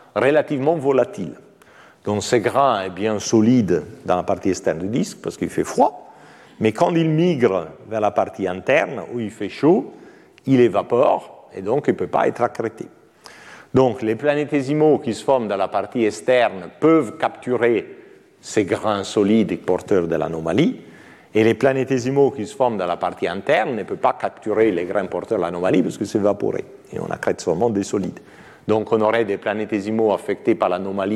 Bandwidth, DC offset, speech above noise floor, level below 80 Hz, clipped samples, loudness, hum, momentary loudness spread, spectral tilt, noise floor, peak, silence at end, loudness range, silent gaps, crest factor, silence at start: 13 kHz; under 0.1%; 29 dB; -58 dBFS; under 0.1%; -20 LUFS; none; 9 LU; -6 dB/octave; -49 dBFS; -4 dBFS; 0 s; 2 LU; none; 16 dB; 0.15 s